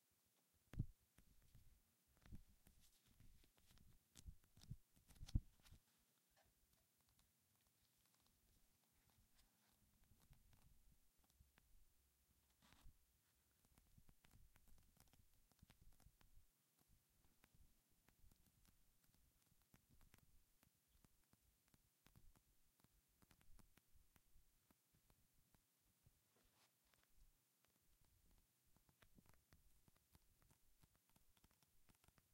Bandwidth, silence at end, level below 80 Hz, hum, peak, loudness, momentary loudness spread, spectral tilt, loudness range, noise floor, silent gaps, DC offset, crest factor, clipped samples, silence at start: 16 kHz; 0 s; -70 dBFS; none; -30 dBFS; -57 LUFS; 16 LU; -5.5 dB/octave; 8 LU; -84 dBFS; none; under 0.1%; 36 dB; under 0.1%; 0 s